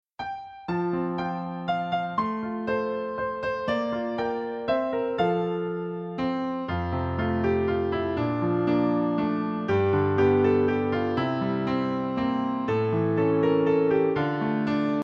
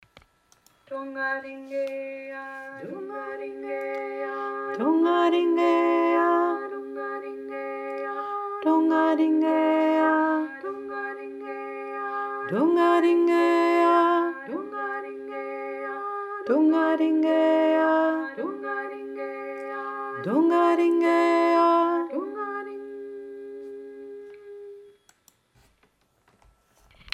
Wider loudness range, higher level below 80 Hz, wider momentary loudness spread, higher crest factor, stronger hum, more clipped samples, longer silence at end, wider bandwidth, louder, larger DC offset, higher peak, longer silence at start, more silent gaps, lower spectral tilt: second, 4 LU vs 11 LU; first, -52 dBFS vs -72 dBFS; second, 8 LU vs 17 LU; about the same, 14 dB vs 16 dB; neither; neither; about the same, 0 s vs 0.05 s; second, 7 kHz vs 8.2 kHz; about the same, -26 LUFS vs -24 LUFS; neither; about the same, -10 dBFS vs -10 dBFS; second, 0.2 s vs 0.9 s; neither; first, -9 dB/octave vs -6 dB/octave